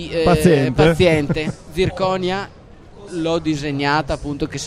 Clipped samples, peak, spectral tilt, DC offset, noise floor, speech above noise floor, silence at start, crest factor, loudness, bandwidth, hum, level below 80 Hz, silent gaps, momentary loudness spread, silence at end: under 0.1%; 0 dBFS; -6 dB/octave; under 0.1%; -40 dBFS; 23 dB; 0 s; 18 dB; -18 LUFS; 15 kHz; none; -36 dBFS; none; 11 LU; 0 s